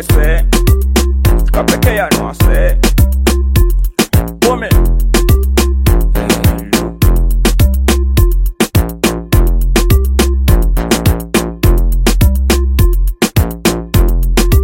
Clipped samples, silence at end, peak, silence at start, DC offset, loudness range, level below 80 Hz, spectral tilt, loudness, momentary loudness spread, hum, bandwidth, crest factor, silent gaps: under 0.1%; 0 s; 0 dBFS; 0 s; under 0.1%; 1 LU; -12 dBFS; -5.5 dB/octave; -12 LUFS; 3 LU; none; 17 kHz; 10 dB; none